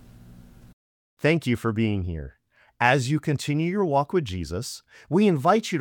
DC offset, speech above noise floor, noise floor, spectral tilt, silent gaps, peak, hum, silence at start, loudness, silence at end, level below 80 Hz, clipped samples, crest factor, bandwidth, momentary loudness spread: under 0.1%; 24 dB; -48 dBFS; -6 dB/octave; 0.73-1.17 s; -4 dBFS; none; 0.3 s; -24 LUFS; 0 s; -52 dBFS; under 0.1%; 20 dB; 18 kHz; 13 LU